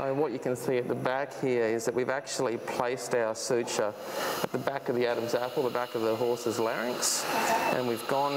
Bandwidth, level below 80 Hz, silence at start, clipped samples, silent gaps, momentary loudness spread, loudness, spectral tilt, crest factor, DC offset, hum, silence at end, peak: 16 kHz; -74 dBFS; 0 s; under 0.1%; none; 4 LU; -30 LUFS; -3.5 dB/octave; 20 dB; under 0.1%; none; 0 s; -10 dBFS